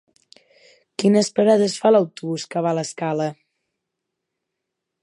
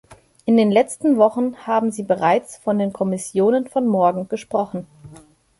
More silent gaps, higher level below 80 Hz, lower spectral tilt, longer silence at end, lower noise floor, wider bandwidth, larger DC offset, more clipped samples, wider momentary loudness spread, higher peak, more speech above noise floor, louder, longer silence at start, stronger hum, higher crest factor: neither; second, -72 dBFS vs -62 dBFS; about the same, -5.5 dB/octave vs -6 dB/octave; first, 1.7 s vs 0.45 s; first, -81 dBFS vs -47 dBFS; about the same, 11.5 kHz vs 11.5 kHz; neither; neither; about the same, 10 LU vs 8 LU; about the same, -4 dBFS vs -2 dBFS; first, 62 dB vs 28 dB; about the same, -20 LUFS vs -19 LUFS; first, 1 s vs 0.1 s; neither; about the same, 18 dB vs 18 dB